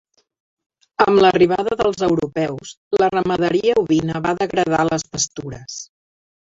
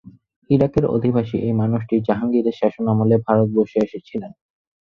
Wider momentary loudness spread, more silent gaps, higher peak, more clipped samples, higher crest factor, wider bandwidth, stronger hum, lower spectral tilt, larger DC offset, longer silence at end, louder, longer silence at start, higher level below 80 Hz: first, 18 LU vs 8 LU; first, 2.77-2.91 s vs none; about the same, -2 dBFS vs -2 dBFS; neither; about the same, 18 dB vs 18 dB; first, 7.8 kHz vs 6.6 kHz; neither; second, -4.5 dB/octave vs -10.5 dB/octave; neither; about the same, 0.65 s vs 0.55 s; about the same, -18 LUFS vs -19 LUFS; first, 1 s vs 0.5 s; about the same, -50 dBFS vs -48 dBFS